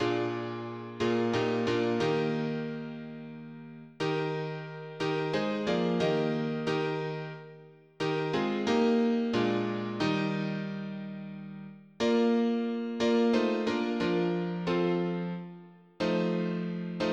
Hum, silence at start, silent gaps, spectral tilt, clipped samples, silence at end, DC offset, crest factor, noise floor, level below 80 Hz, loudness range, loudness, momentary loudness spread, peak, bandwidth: none; 0 s; none; -6.5 dB/octave; under 0.1%; 0 s; under 0.1%; 16 dB; -53 dBFS; -66 dBFS; 4 LU; -30 LUFS; 15 LU; -16 dBFS; 8.6 kHz